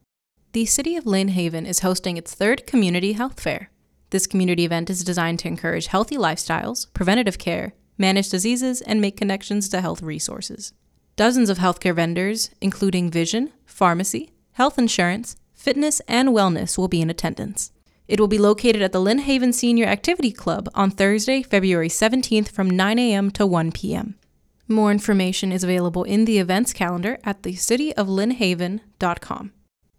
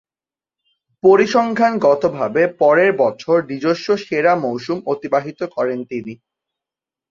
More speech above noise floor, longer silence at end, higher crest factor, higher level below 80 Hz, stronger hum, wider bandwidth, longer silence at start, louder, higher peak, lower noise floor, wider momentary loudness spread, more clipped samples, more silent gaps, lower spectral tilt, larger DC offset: second, 47 dB vs over 74 dB; second, 0.5 s vs 0.95 s; about the same, 18 dB vs 16 dB; first, -46 dBFS vs -62 dBFS; neither; first, 16 kHz vs 7.4 kHz; second, 0.55 s vs 1.05 s; second, -21 LUFS vs -17 LUFS; about the same, -4 dBFS vs -2 dBFS; second, -67 dBFS vs under -90 dBFS; about the same, 9 LU vs 10 LU; neither; neither; second, -4.5 dB/octave vs -6 dB/octave; neither